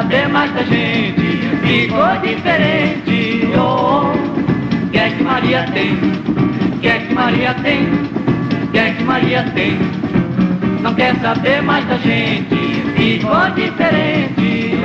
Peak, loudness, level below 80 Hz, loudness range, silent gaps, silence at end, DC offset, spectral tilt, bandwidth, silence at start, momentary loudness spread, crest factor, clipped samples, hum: -2 dBFS; -14 LUFS; -42 dBFS; 1 LU; none; 0 s; under 0.1%; -7.5 dB/octave; 7.4 kHz; 0 s; 3 LU; 14 dB; under 0.1%; none